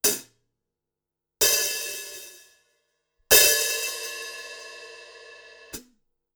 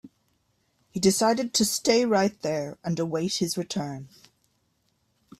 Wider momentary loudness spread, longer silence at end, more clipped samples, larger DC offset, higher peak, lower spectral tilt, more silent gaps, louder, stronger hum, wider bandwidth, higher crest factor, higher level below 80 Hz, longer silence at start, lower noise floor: first, 26 LU vs 10 LU; second, 0.55 s vs 1.35 s; neither; neither; first, -2 dBFS vs -6 dBFS; second, 1 dB/octave vs -4 dB/octave; neither; first, -20 LUFS vs -25 LUFS; neither; first, over 20 kHz vs 15.5 kHz; first, 26 dB vs 20 dB; first, -58 dBFS vs -64 dBFS; about the same, 0.05 s vs 0.05 s; first, -87 dBFS vs -71 dBFS